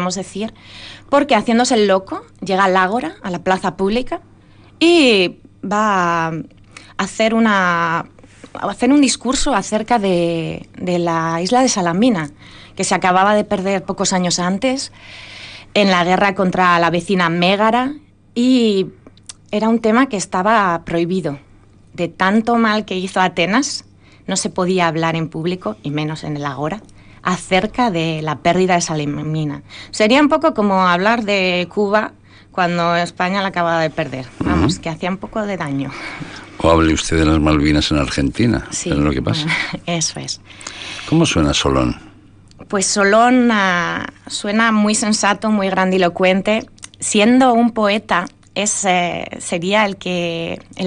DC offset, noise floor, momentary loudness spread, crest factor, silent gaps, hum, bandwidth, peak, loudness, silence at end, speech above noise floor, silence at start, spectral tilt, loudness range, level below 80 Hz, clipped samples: under 0.1%; -46 dBFS; 13 LU; 14 dB; none; none; 10 kHz; -2 dBFS; -16 LUFS; 0 s; 30 dB; 0 s; -4.5 dB/octave; 4 LU; -38 dBFS; under 0.1%